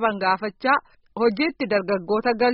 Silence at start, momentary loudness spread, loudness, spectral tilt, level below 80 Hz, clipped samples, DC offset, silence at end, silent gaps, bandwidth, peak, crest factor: 0 s; 3 LU; -23 LUFS; -3 dB/octave; -60 dBFS; under 0.1%; under 0.1%; 0 s; none; 5.6 kHz; -6 dBFS; 16 dB